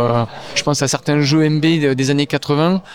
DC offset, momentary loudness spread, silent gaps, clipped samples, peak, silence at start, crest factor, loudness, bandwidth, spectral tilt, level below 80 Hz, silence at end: 0.5%; 5 LU; none; under 0.1%; -2 dBFS; 0 s; 14 dB; -16 LUFS; 16 kHz; -5 dB/octave; -48 dBFS; 0 s